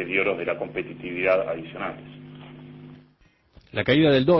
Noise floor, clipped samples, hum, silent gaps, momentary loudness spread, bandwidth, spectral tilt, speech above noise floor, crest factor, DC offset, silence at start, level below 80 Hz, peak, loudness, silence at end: -60 dBFS; under 0.1%; none; none; 24 LU; 6 kHz; -8.5 dB/octave; 37 dB; 18 dB; under 0.1%; 0 s; -54 dBFS; -8 dBFS; -24 LUFS; 0 s